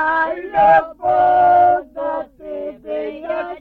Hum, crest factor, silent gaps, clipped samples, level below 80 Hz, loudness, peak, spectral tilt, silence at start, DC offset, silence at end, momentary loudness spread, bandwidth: none; 14 dB; none; under 0.1%; -50 dBFS; -16 LUFS; -2 dBFS; -7 dB/octave; 0 s; under 0.1%; 0 s; 16 LU; 4.6 kHz